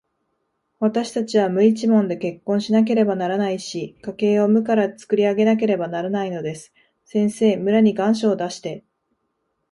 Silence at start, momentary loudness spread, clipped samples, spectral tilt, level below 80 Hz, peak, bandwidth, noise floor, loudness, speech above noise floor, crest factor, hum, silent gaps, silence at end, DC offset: 0.8 s; 12 LU; under 0.1%; -6.5 dB/octave; -66 dBFS; -4 dBFS; 11.5 kHz; -73 dBFS; -20 LUFS; 54 dB; 16 dB; none; none; 0.9 s; under 0.1%